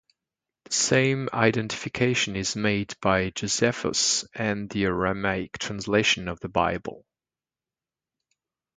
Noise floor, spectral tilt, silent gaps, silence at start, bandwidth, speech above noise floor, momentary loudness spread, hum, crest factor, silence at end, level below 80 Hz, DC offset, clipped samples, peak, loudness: under -90 dBFS; -3.5 dB/octave; none; 0.7 s; 9.6 kHz; over 65 dB; 7 LU; none; 22 dB; 1.8 s; -52 dBFS; under 0.1%; under 0.1%; -4 dBFS; -25 LUFS